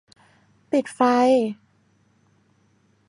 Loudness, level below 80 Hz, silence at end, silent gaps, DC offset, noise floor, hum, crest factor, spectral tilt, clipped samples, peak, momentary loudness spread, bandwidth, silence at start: -21 LUFS; -76 dBFS; 1.55 s; none; under 0.1%; -62 dBFS; none; 18 dB; -5 dB/octave; under 0.1%; -6 dBFS; 12 LU; 11 kHz; 0.7 s